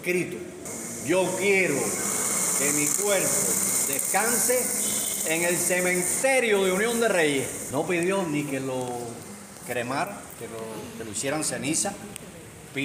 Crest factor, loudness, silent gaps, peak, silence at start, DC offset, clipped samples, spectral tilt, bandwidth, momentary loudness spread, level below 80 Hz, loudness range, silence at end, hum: 18 dB; -24 LUFS; none; -8 dBFS; 0 s; under 0.1%; under 0.1%; -2.5 dB/octave; 16 kHz; 15 LU; -62 dBFS; 8 LU; 0 s; none